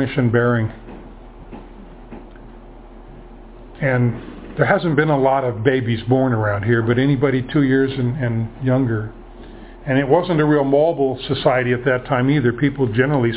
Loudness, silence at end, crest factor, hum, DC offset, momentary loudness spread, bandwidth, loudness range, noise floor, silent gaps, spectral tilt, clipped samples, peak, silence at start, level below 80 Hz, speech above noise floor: -18 LUFS; 0 s; 18 dB; none; under 0.1%; 22 LU; 4 kHz; 9 LU; -39 dBFS; none; -11.5 dB/octave; under 0.1%; 0 dBFS; 0 s; -42 dBFS; 22 dB